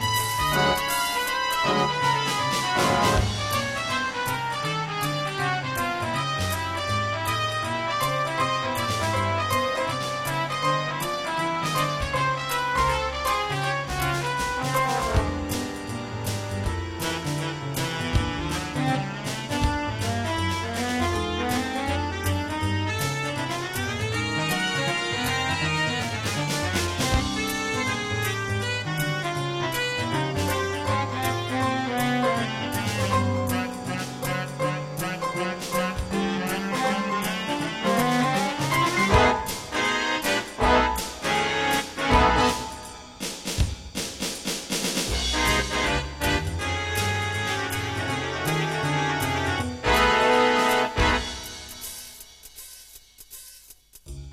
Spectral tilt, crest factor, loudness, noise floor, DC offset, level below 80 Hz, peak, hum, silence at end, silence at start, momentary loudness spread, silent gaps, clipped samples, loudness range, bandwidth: -4 dB/octave; 20 dB; -25 LUFS; -50 dBFS; under 0.1%; -38 dBFS; -6 dBFS; none; 0 s; 0 s; 7 LU; none; under 0.1%; 4 LU; 16 kHz